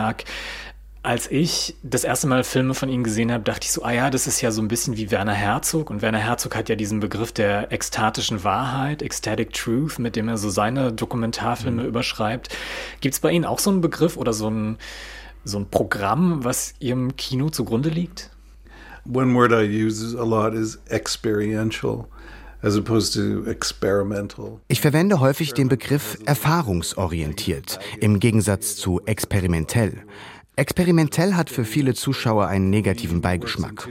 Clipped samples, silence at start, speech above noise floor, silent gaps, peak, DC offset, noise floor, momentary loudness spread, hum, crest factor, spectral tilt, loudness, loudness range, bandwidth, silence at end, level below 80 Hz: under 0.1%; 0 s; 23 dB; none; -2 dBFS; under 0.1%; -44 dBFS; 10 LU; none; 20 dB; -5 dB/octave; -22 LUFS; 3 LU; 16.5 kHz; 0 s; -44 dBFS